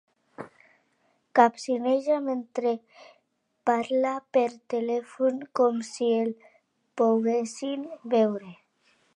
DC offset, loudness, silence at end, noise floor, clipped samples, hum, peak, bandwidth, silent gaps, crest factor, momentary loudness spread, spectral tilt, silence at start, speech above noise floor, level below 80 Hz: under 0.1%; -26 LUFS; 0.65 s; -72 dBFS; under 0.1%; none; -4 dBFS; 11 kHz; none; 24 dB; 13 LU; -5 dB/octave; 0.4 s; 47 dB; -82 dBFS